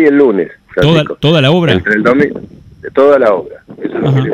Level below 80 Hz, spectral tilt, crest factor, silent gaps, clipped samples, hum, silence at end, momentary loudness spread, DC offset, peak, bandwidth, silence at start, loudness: -40 dBFS; -7.5 dB/octave; 10 dB; none; 0.4%; none; 0 s; 13 LU; under 0.1%; 0 dBFS; 10 kHz; 0 s; -11 LUFS